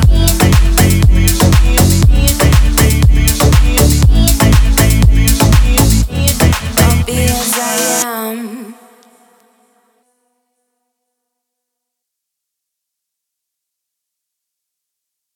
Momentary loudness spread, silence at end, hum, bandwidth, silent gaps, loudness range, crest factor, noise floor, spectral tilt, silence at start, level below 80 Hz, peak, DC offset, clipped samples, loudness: 4 LU; 6.6 s; none; over 20 kHz; none; 9 LU; 12 dB; -78 dBFS; -4.5 dB/octave; 0 s; -14 dBFS; 0 dBFS; under 0.1%; under 0.1%; -10 LUFS